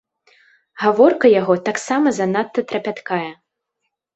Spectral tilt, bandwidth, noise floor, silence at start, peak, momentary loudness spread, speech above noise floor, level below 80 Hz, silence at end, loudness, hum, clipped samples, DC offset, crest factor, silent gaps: -5.5 dB/octave; 8.2 kHz; -76 dBFS; 0.75 s; -2 dBFS; 11 LU; 60 dB; -62 dBFS; 0.85 s; -17 LUFS; none; under 0.1%; under 0.1%; 16 dB; none